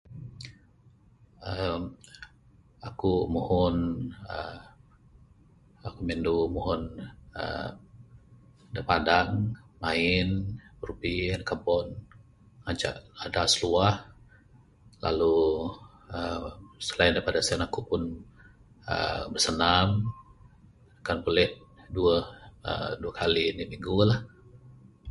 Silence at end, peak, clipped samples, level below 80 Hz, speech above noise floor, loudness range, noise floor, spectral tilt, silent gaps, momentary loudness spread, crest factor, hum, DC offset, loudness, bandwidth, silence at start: 0 s; -4 dBFS; under 0.1%; -46 dBFS; 31 dB; 6 LU; -59 dBFS; -4.5 dB/octave; none; 19 LU; 24 dB; none; under 0.1%; -28 LUFS; 11.5 kHz; 0.1 s